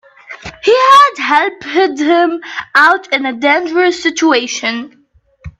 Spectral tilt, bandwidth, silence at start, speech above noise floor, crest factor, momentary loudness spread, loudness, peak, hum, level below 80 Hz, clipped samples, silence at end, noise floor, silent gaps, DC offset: -2.5 dB/octave; 13 kHz; 0.3 s; 31 dB; 12 dB; 11 LU; -11 LUFS; 0 dBFS; none; -50 dBFS; under 0.1%; 0.1 s; -44 dBFS; none; under 0.1%